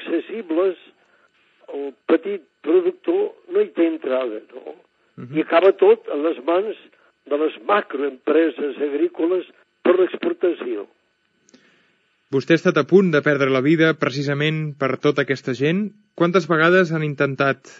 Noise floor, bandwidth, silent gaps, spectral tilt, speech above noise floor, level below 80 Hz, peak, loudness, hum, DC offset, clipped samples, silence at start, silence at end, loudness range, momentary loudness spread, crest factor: -66 dBFS; 7.6 kHz; none; -7 dB/octave; 46 dB; -82 dBFS; -2 dBFS; -20 LUFS; none; under 0.1%; under 0.1%; 0 s; 0.25 s; 5 LU; 13 LU; 18 dB